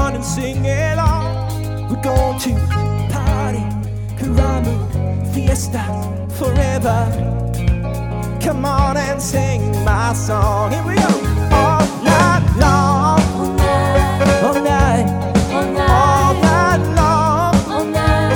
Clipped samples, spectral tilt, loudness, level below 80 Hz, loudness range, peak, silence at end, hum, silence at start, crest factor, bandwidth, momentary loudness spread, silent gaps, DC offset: under 0.1%; -6 dB/octave; -16 LUFS; -24 dBFS; 5 LU; 0 dBFS; 0 s; none; 0 s; 14 dB; 19 kHz; 8 LU; none; under 0.1%